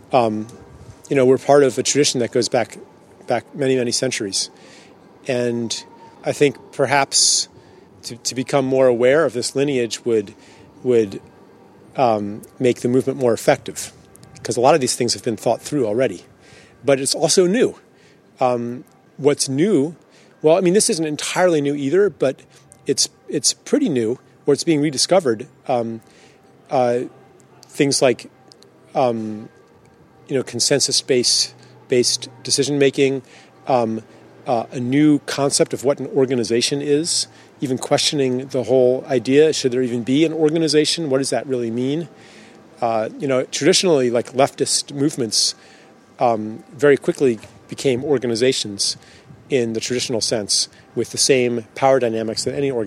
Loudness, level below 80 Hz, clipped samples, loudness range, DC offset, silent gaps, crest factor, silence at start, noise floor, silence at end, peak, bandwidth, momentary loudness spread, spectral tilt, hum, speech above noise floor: -18 LUFS; -64 dBFS; under 0.1%; 4 LU; under 0.1%; none; 20 dB; 0.1 s; -51 dBFS; 0 s; 0 dBFS; 14.5 kHz; 11 LU; -3.5 dB/octave; none; 32 dB